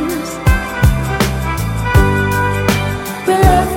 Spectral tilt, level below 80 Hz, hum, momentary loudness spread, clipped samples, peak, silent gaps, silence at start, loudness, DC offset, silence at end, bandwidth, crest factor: -5.5 dB/octave; -20 dBFS; none; 7 LU; under 0.1%; 0 dBFS; none; 0 s; -15 LUFS; under 0.1%; 0 s; 17 kHz; 14 dB